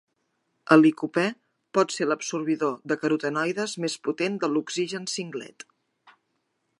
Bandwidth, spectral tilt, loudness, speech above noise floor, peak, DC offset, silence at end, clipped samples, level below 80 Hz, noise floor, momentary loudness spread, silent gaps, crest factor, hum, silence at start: 11.5 kHz; -4.5 dB/octave; -25 LUFS; 51 dB; -2 dBFS; under 0.1%; 1.35 s; under 0.1%; -80 dBFS; -75 dBFS; 12 LU; none; 24 dB; none; 0.65 s